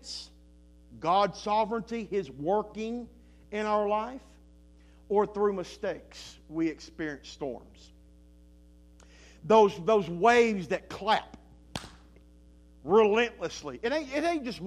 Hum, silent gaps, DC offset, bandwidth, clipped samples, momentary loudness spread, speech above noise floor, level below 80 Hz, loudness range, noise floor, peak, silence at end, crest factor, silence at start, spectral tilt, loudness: none; none; under 0.1%; 11.5 kHz; under 0.1%; 19 LU; 27 dB; -56 dBFS; 9 LU; -56 dBFS; -8 dBFS; 0 s; 22 dB; 0.05 s; -5 dB/octave; -28 LUFS